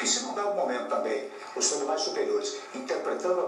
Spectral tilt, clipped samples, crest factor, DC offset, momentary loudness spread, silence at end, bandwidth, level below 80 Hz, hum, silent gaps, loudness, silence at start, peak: -1 dB/octave; under 0.1%; 16 dB; under 0.1%; 8 LU; 0 s; 12 kHz; under -90 dBFS; none; none; -29 LUFS; 0 s; -12 dBFS